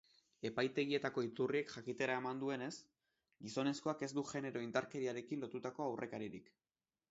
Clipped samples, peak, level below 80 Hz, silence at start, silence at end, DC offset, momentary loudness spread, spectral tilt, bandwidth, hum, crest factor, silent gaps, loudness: under 0.1%; -24 dBFS; -82 dBFS; 0.45 s; 0.7 s; under 0.1%; 9 LU; -4 dB/octave; 7.6 kHz; none; 20 dB; none; -42 LUFS